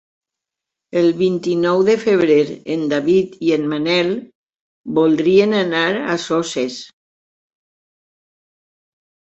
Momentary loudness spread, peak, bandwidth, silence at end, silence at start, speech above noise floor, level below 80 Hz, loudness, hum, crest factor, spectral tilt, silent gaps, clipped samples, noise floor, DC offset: 9 LU; -2 dBFS; 8.2 kHz; 2.5 s; 0.95 s; 68 dB; -62 dBFS; -17 LUFS; none; 16 dB; -5.5 dB/octave; 4.35-4.47 s, 4.60-4.84 s; under 0.1%; -84 dBFS; under 0.1%